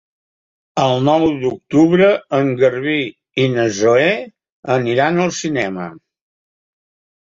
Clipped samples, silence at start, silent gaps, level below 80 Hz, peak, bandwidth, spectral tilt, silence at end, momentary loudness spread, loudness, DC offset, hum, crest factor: under 0.1%; 0.75 s; 4.52-4.63 s; -56 dBFS; -2 dBFS; 7.8 kHz; -5.5 dB/octave; 1.3 s; 10 LU; -16 LUFS; under 0.1%; none; 16 dB